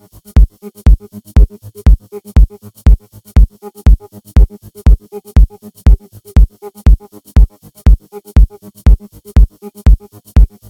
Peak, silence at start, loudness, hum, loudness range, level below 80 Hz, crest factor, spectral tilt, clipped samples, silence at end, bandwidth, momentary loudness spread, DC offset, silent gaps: 0 dBFS; 0.35 s; -14 LUFS; none; 0 LU; -10 dBFS; 10 dB; -8 dB/octave; 1%; 0.25 s; 10 kHz; 3 LU; under 0.1%; none